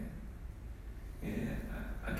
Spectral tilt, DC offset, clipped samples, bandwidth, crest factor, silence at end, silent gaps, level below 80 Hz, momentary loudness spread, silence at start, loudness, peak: -7 dB/octave; under 0.1%; under 0.1%; 15.5 kHz; 16 dB; 0 s; none; -44 dBFS; 10 LU; 0 s; -44 LUFS; -26 dBFS